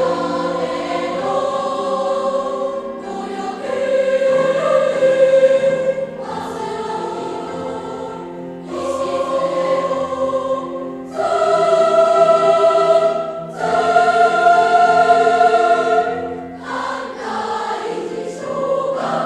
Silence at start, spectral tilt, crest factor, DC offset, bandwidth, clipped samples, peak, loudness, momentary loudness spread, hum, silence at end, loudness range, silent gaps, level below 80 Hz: 0 s; -4.5 dB/octave; 16 dB; under 0.1%; 10.5 kHz; under 0.1%; 0 dBFS; -17 LUFS; 14 LU; none; 0 s; 8 LU; none; -58 dBFS